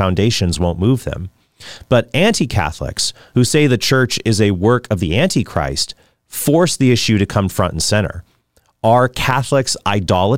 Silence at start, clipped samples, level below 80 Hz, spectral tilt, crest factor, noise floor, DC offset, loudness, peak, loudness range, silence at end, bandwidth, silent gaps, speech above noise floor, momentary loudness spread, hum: 0 s; under 0.1%; -38 dBFS; -5 dB/octave; 14 dB; -59 dBFS; 1%; -16 LUFS; -2 dBFS; 2 LU; 0 s; 16.5 kHz; none; 43 dB; 8 LU; none